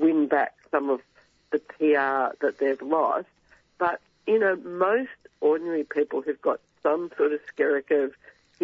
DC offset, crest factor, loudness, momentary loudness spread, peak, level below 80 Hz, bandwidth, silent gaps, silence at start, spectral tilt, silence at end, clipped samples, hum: under 0.1%; 16 dB; -26 LUFS; 7 LU; -8 dBFS; -74 dBFS; 5.8 kHz; none; 0 s; -7 dB/octave; 0 s; under 0.1%; none